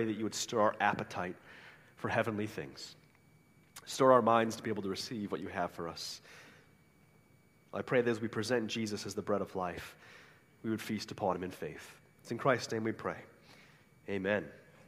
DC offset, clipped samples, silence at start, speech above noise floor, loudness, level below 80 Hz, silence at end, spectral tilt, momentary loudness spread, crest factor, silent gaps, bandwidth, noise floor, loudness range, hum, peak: under 0.1%; under 0.1%; 0 s; 31 dB; -35 LUFS; -72 dBFS; 0.25 s; -4.5 dB/octave; 21 LU; 24 dB; none; 15.5 kHz; -66 dBFS; 6 LU; none; -12 dBFS